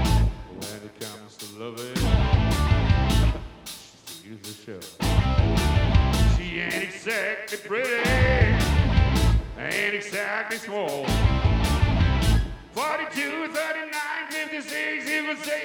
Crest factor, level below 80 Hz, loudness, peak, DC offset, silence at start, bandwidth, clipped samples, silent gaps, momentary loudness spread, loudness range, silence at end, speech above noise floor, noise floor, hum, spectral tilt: 16 dB; -28 dBFS; -24 LUFS; -6 dBFS; under 0.1%; 0 s; over 20 kHz; under 0.1%; none; 16 LU; 2 LU; 0 s; 17 dB; -44 dBFS; none; -5.5 dB/octave